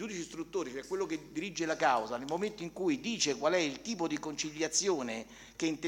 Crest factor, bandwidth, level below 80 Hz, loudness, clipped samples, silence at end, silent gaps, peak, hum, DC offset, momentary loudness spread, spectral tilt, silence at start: 18 dB; 16.5 kHz; -66 dBFS; -34 LUFS; under 0.1%; 0 s; none; -16 dBFS; none; under 0.1%; 9 LU; -3 dB/octave; 0 s